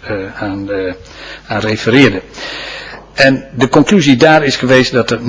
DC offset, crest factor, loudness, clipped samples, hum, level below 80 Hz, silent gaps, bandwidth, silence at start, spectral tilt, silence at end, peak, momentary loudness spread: under 0.1%; 12 dB; -11 LUFS; 0.8%; none; -40 dBFS; none; 8 kHz; 0.05 s; -5 dB/octave; 0 s; 0 dBFS; 17 LU